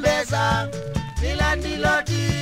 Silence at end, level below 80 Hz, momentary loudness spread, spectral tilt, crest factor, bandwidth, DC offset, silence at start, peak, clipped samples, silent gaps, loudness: 0 s; -30 dBFS; 7 LU; -4.5 dB/octave; 18 dB; 16 kHz; under 0.1%; 0 s; -4 dBFS; under 0.1%; none; -22 LUFS